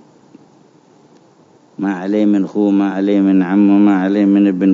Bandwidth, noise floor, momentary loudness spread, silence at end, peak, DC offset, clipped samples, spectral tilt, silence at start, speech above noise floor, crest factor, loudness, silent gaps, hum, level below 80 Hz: 7 kHz; -48 dBFS; 7 LU; 0 s; -2 dBFS; under 0.1%; under 0.1%; -9 dB/octave; 1.8 s; 36 dB; 12 dB; -13 LUFS; none; none; -70 dBFS